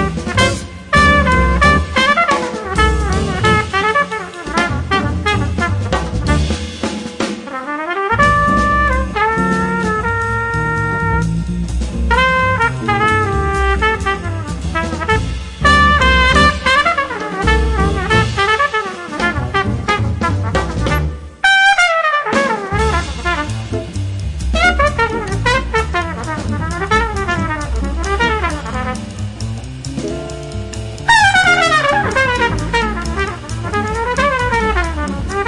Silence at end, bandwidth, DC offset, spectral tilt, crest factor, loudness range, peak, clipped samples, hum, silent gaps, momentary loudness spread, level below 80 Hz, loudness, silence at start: 0 s; 12 kHz; under 0.1%; -5 dB/octave; 16 dB; 5 LU; 0 dBFS; under 0.1%; none; none; 12 LU; -24 dBFS; -15 LUFS; 0 s